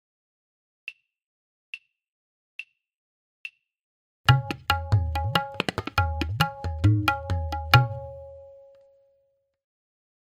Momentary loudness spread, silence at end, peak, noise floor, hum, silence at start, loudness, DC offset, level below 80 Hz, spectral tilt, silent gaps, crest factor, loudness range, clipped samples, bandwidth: 21 LU; 1.75 s; -2 dBFS; -70 dBFS; none; 0.85 s; -25 LUFS; under 0.1%; -44 dBFS; -5.5 dB/octave; 1.26-1.73 s, 2.09-2.59 s, 2.98-3.44 s, 3.83-4.24 s; 28 dB; 21 LU; under 0.1%; 16 kHz